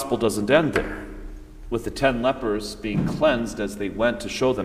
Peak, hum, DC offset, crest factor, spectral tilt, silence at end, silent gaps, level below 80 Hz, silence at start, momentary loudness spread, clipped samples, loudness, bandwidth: -6 dBFS; none; under 0.1%; 18 dB; -5.5 dB/octave; 0 s; none; -40 dBFS; 0 s; 16 LU; under 0.1%; -23 LUFS; 15.5 kHz